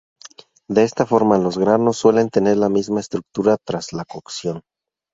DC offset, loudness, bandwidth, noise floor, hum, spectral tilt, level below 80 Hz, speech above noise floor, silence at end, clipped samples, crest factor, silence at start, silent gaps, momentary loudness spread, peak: under 0.1%; -18 LUFS; 7.8 kHz; -45 dBFS; none; -6 dB/octave; -56 dBFS; 27 dB; 0.55 s; under 0.1%; 18 dB; 0.25 s; none; 13 LU; -2 dBFS